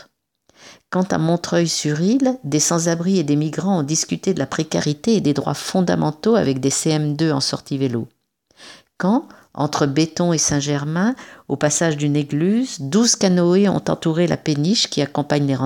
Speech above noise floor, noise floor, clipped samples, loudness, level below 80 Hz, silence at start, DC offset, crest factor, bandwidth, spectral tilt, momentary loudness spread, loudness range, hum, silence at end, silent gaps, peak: 43 dB; -62 dBFS; under 0.1%; -19 LUFS; -56 dBFS; 0.65 s; under 0.1%; 16 dB; 17 kHz; -4.5 dB/octave; 6 LU; 3 LU; none; 0 s; none; -4 dBFS